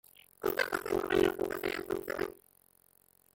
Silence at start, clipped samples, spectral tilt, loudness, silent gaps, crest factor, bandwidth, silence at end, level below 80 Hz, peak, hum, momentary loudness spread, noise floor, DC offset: 0.4 s; under 0.1%; -4.5 dB/octave; -33 LUFS; none; 20 dB; 17 kHz; 1.05 s; -60 dBFS; -16 dBFS; none; 9 LU; -67 dBFS; under 0.1%